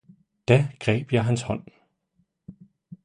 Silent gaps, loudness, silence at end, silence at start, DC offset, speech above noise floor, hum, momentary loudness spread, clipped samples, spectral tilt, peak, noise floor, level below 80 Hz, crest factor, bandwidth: none; -24 LUFS; 0.1 s; 0.5 s; under 0.1%; 48 dB; none; 12 LU; under 0.1%; -6.5 dB/octave; -4 dBFS; -71 dBFS; -54 dBFS; 22 dB; 10.5 kHz